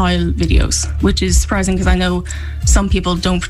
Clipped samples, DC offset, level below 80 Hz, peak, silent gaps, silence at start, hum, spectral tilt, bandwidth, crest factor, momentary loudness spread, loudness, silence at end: under 0.1%; under 0.1%; -18 dBFS; -2 dBFS; none; 0 s; none; -4.5 dB/octave; 13 kHz; 12 dB; 4 LU; -15 LUFS; 0 s